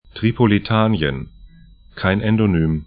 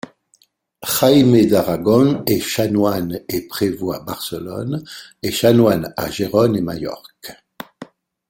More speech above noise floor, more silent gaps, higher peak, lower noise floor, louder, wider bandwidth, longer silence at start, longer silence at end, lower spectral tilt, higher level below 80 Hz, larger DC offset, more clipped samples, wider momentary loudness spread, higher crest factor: second, 28 dB vs 42 dB; neither; about the same, 0 dBFS vs 0 dBFS; second, -45 dBFS vs -59 dBFS; about the same, -18 LUFS vs -17 LUFS; second, 5 kHz vs 17 kHz; second, 0.15 s vs 0.8 s; second, 0.05 s vs 0.45 s; first, -12.5 dB/octave vs -5.5 dB/octave; first, -38 dBFS vs -52 dBFS; neither; neither; second, 7 LU vs 23 LU; about the same, 18 dB vs 18 dB